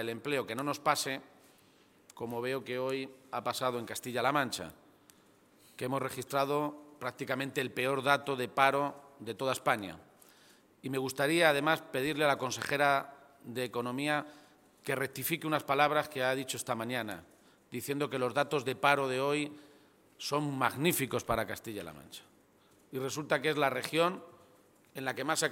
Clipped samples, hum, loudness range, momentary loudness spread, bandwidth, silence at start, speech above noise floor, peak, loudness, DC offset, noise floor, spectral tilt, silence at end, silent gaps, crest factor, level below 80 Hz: under 0.1%; none; 5 LU; 15 LU; 17 kHz; 0 s; 32 dB; -8 dBFS; -33 LUFS; under 0.1%; -65 dBFS; -4 dB/octave; 0 s; none; 26 dB; -70 dBFS